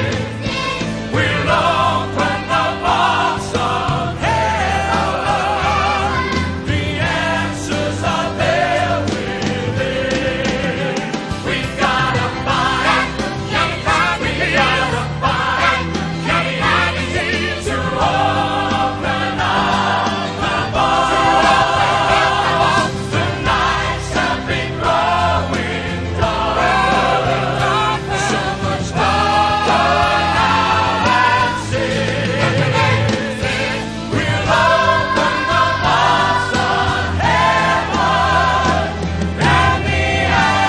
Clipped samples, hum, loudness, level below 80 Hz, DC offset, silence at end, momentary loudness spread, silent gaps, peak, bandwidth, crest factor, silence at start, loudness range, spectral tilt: under 0.1%; none; -16 LUFS; -32 dBFS; under 0.1%; 0 s; 6 LU; none; 0 dBFS; 11 kHz; 16 dB; 0 s; 3 LU; -4.5 dB/octave